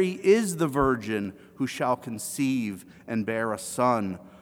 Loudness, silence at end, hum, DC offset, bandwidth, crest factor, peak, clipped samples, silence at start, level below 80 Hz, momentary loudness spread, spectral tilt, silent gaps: -27 LUFS; 0.05 s; none; under 0.1%; over 20 kHz; 18 dB; -8 dBFS; under 0.1%; 0 s; -52 dBFS; 11 LU; -5.5 dB/octave; none